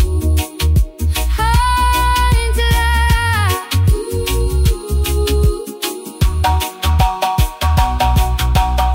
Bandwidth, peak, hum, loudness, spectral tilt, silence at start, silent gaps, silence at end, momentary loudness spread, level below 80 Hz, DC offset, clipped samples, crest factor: 16.5 kHz; -2 dBFS; none; -16 LUFS; -4.5 dB/octave; 0 s; none; 0 s; 5 LU; -16 dBFS; under 0.1%; under 0.1%; 12 dB